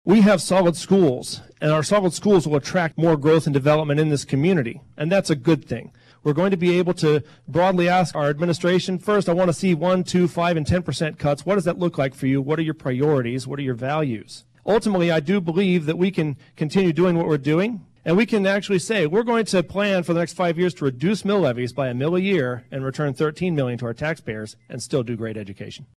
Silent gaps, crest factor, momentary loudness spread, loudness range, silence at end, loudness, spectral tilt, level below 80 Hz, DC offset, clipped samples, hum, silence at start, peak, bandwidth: none; 14 dB; 9 LU; 3 LU; 0.15 s; -21 LUFS; -6.5 dB/octave; -52 dBFS; under 0.1%; under 0.1%; none; 0.05 s; -6 dBFS; 13 kHz